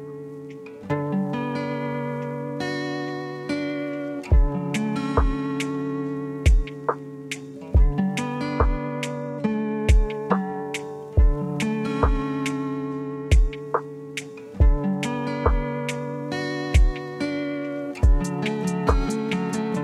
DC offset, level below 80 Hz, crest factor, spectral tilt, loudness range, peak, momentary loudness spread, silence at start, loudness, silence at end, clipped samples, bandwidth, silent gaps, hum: under 0.1%; -26 dBFS; 18 dB; -6.5 dB/octave; 3 LU; -4 dBFS; 9 LU; 0 s; -25 LUFS; 0 s; under 0.1%; 12 kHz; none; none